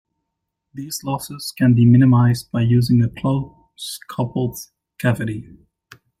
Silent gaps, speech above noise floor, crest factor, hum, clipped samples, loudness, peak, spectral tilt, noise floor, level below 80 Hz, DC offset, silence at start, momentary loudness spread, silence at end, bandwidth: none; 61 dB; 16 dB; none; under 0.1%; -18 LUFS; -2 dBFS; -7 dB/octave; -78 dBFS; -50 dBFS; under 0.1%; 0.75 s; 20 LU; 0.8 s; 15.5 kHz